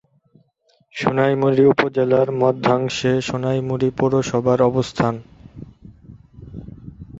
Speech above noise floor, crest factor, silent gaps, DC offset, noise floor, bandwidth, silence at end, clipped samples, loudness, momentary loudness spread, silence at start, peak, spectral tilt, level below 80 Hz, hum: 44 dB; 18 dB; none; under 0.1%; -62 dBFS; 8 kHz; 0 s; under 0.1%; -18 LUFS; 21 LU; 0.95 s; -2 dBFS; -6.5 dB/octave; -50 dBFS; none